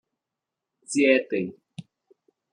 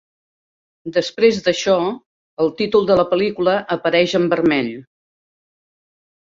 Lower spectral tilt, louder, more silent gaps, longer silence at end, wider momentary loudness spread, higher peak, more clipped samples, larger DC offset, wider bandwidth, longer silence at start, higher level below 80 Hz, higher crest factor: about the same, -4.5 dB/octave vs -5 dB/octave; second, -24 LUFS vs -17 LUFS; second, none vs 2.06-2.37 s; second, 0.7 s vs 1.4 s; first, 25 LU vs 9 LU; second, -6 dBFS vs -2 dBFS; neither; neither; first, 10.5 kHz vs 7.8 kHz; about the same, 0.9 s vs 0.85 s; second, -76 dBFS vs -56 dBFS; first, 22 dB vs 16 dB